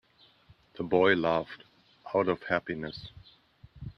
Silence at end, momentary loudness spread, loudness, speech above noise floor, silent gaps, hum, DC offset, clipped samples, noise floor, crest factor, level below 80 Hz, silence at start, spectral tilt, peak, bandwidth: 0.05 s; 23 LU; -29 LUFS; 33 dB; none; none; under 0.1%; under 0.1%; -61 dBFS; 22 dB; -60 dBFS; 0.75 s; -7.5 dB/octave; -10 dBFS; 6.4 kHz